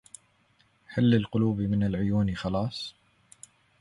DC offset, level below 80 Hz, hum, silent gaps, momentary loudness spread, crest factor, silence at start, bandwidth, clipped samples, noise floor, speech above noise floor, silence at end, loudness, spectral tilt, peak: under 0.1%; -50 dBFS; none; none; 11 LU; 18 dB; 0.9 s; 11.5 kHz; under 0.1%; -66 dBFS; 40 dB; 0.9 s; -27 LUFS; -7.5 dB/octave; -10 dBFS